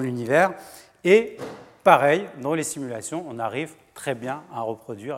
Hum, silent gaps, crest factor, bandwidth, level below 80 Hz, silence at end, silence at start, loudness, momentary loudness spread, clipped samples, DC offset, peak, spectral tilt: none; none; 22 dB; 16.5 kHz; -68 dBFS; 0 s; 0 s; -23 LUFS; 16 LU; under 0.1%; under 0.1%; 0 dBFS; -5 dB/octave